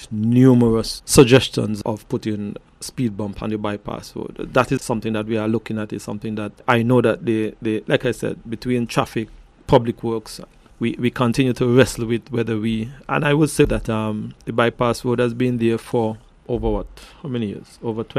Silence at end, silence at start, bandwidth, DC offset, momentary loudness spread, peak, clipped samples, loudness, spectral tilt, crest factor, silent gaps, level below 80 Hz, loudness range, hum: 0 s; 0 s; 15 kHz; under 0.1%; 13 LU; 0 dBFS; under 0.1%; -20 LUFS; -6 dB/octave; 20 dB; none; -40 dBFS; 5 LU; none